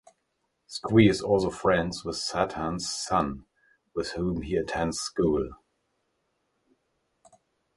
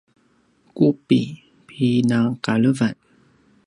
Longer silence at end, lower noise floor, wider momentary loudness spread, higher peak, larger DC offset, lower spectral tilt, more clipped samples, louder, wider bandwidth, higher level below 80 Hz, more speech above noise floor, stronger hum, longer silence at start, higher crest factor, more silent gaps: first, 2.2 s vs 0.75 s; first, -77 dBFS vs -61 dBFS; about the same, 14 LU vs 12 LU; about the same, -6 dBFS vs -4 dBFS; neither; second, -5 dB/octave vs -7 dB/octave; neither; second, -27 LUFS vs -20 LUFS; about the same, 11.5 kHz vs 11 kHz; first, -50 dBFS vs -62 dBFS; first, 51 dB vs 42 dB; neither; about the same, 0.7 s vs 0.75 s; first, 24 dB vs 18 dB; neither